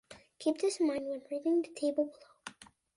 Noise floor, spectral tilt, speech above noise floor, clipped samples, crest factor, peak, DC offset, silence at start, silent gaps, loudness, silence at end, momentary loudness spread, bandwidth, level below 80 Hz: -52 dBFS; -3.5 dB/octave; 20 dB; under 0.1%; 16 dB; -18 dBFS; under 0.1%; 0.1 s; none; -34 LUFS; 0.35 s; 18 LU; 11.5 kHz; -78 dBFS